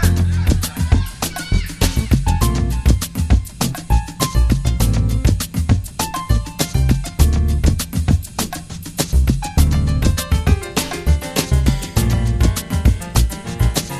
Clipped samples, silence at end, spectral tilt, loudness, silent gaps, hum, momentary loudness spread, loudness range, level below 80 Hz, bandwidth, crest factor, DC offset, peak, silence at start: under 0.1%; 0 s; -5 dB/octave; -18 LUFS; none; none; 5 LU; 1 LU; -20 dBFS; 14 kHz; 16 dB; under 0.1%; 0 dBFS; 0 s